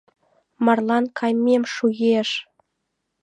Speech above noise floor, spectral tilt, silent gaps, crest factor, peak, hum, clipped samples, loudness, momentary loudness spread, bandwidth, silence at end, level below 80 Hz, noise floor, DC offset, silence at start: 57 dB; -5 dB/octave; none; 18 dB; -4 dBFS; none; under 0.1%; -20 LUFS; 4 LU; 9 kHz; 0.8 s; -74 dBFS; -77 dBFS; under 0.1%; 0.6 s